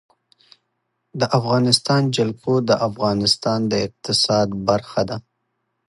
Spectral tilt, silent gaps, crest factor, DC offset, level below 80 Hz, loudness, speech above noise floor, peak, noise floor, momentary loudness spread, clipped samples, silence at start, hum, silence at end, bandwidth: -5 dB/octave; none; 20 dB; under 0.1%; -54 dBFS; -19 LUFS; 54 dB; 0 dBFS; -74 dBFS; 8 LU; under 0.1%; 1.15 s; none; 0.7 s; 11.5 kHz